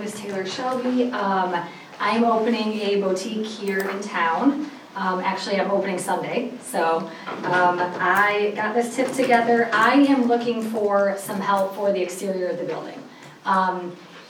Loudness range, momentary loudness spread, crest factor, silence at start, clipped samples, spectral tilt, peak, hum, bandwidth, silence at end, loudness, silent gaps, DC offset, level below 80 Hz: 5 LU; 11 LU; 18 dB; 0 s; under 0.1%; -4.5 dB/octave; -4 dBFS; none; over 20 kHz; 0 s; -22 LUFS; none; under 0.1%; -76 dBFS